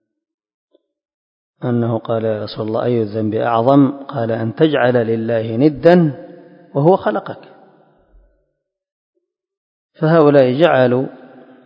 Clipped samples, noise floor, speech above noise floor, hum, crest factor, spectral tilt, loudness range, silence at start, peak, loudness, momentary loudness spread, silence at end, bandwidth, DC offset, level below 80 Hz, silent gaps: under 0.1%; -72 dBFS; 58 dB; none; 16 dB; -10 dB/octave; 7 LU; 1.6 s; 0 dBFS; -15 LUFS; 11 LU; 0.5 s; 5.4 kHz; under 0.1%; -56 dBFS; 8.92-9.13 s, 9.57-9.89 s